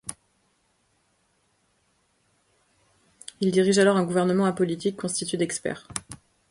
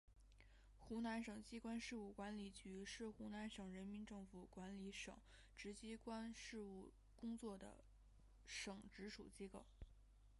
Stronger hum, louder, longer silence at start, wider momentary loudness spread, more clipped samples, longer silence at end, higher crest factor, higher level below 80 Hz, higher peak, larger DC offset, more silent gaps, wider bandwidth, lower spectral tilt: neither; first, -24 LUFS vs -54 LUFS; about the same, 0.05 s vs 0.05 s; first, 23 LU vs 13 LU; neither; first, 0.35 s vs 0 s; about the same, 20 dB vs 18 dB; about the same, -64 dBFS vs -68 dBFS; first, -6 dBFS vs -36 dBFS; neither; neither; about the same, 11.5 kHz vs 11.5 kHz; about the same, -5 dB/octave vs -4.5 dB/octave